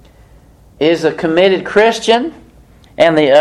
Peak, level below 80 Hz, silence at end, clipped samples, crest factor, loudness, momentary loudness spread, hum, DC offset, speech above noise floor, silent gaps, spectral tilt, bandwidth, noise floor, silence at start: 0 dBFS; -46 dBFS; 0 s; under 0.1%; 14 dB; -12 LUFS; 4 LU; none; under 0.1%; 32 dB; none; -4.5 dB/octave; 12 kHz; -43 dBFS; 0.8 s